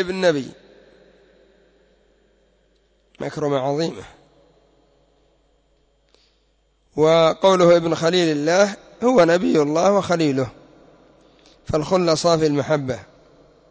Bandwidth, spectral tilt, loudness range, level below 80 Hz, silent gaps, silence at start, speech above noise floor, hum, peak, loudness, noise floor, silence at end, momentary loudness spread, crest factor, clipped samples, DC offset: 8 kHz; -5.5 dB/octave; 12 LU; -54 dBFS; none; 0 s; 45 dB; none; -4 dBFS; -18 LUFS; -63 dBFS; 0.7 s; 14 LU; 16 dB; under 0.1%; under 0.1%